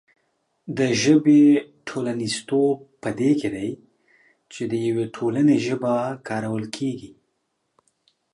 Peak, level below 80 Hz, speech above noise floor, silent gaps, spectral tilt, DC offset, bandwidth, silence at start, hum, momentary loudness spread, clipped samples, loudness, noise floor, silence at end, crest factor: -6 dBFS; -64 dBFS; 53 dB; none; -5.5 dB/octave; under 0.1%; 11.5 kHz; 0.65 s; none; 16 LU; under 0.1%; -22 LUFS; -74 dBFS; 1.25 s; 18 dB